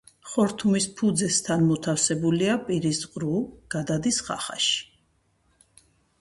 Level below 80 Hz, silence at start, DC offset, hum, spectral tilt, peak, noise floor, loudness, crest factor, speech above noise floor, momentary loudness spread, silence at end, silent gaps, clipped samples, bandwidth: -58 dBFS; 0.25 s; under 0.1%; none; -4 dB/octave; -8 dBFS; -67 dBFS; -25 LUFS; 18 dB; 43 dB; 7 LU; 1.35 s; none; under 0.1%; 11.5 kHz